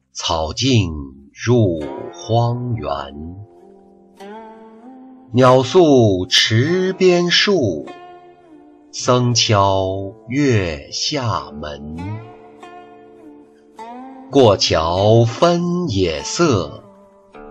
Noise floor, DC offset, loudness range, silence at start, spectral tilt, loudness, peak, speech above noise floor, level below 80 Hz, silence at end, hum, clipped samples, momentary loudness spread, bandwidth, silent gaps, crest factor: -47 dBFS; under 0.1%; 11 LU; 0.15 s; -5 dB/octave; -16 LUFS; -2 dBFS; 31 dB; -42 dBFS; 0 s; none; under 0.1%; 20 LU; 9.2 kHz; none; 16 dB